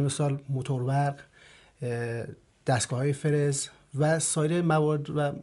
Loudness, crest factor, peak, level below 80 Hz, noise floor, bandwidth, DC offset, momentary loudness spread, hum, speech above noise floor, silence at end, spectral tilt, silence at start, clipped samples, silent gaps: -28 LUFS; 16 dB; -12 dBFS; -64 dBFS; -54 dBFS; 11.5 kHz; under 0.1%; 11 LU; none; 27 dB; 0 s; -5.5 dB/octave; 0 s; under 0.1%; none